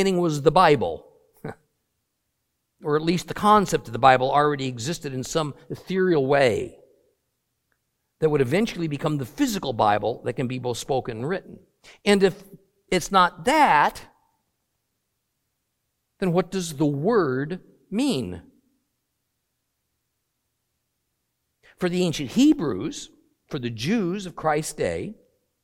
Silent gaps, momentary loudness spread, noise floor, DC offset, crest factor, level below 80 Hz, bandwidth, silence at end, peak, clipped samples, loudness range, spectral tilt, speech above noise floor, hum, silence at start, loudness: none; 15 LU; -77 dBFS; under 0.1%; 22 dB; -54 dBFS; 16.5 kHz; 0.5 s; -2 dBFS; under 0.1%; 6 LU; -5.5 dB/octave; 55 dB; none; 0 s; -23 LUFS